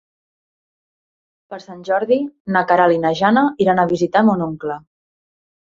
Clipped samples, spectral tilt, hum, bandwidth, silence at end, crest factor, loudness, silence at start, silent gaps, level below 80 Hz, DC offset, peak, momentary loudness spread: under 0.1%; -7 dB/octave; none; 7.6 kHz; 0.8 s; 16 dB; -16 LUFS; 1.5 s; 2.40-2.45 s; -58 dBFS; under 0.1%; -2 dBFS; 17 LU